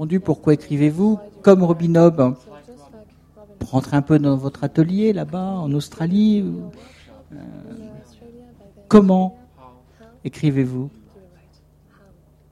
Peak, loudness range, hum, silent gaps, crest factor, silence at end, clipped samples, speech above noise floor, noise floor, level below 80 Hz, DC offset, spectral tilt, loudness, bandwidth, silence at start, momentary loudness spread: 0 dBFS; 6 LU; none; none; 20 dB; 1.6 s; under 0.1%; 35 dB; -53 dBFS; -50 dBFS; under 0.1%; -8.5 dB/octave; -18 LUFS; 11.5 kHz; 0 s; 21 LU